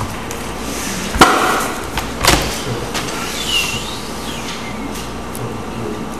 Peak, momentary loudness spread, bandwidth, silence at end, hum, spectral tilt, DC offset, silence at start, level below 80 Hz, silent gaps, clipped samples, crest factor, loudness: 0 dBFS; 13 LU; 16 kHz; 0 s; none; -3 dB/octave; 2%; 0 s; -32 dBFS; none; 0.1%; 20 dB; -18 LUFS